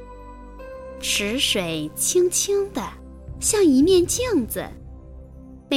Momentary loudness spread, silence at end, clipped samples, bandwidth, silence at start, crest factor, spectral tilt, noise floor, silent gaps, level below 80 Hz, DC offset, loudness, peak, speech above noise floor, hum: 24 LU; 0 s; under 0.1%; 16.5 kHz; 0 s; 16 dB; -3 dB/octave; -42 dBFS; none; -42 dBFS; under 0.1%; -20 LUFS; -6 dBFS; 22 dB; none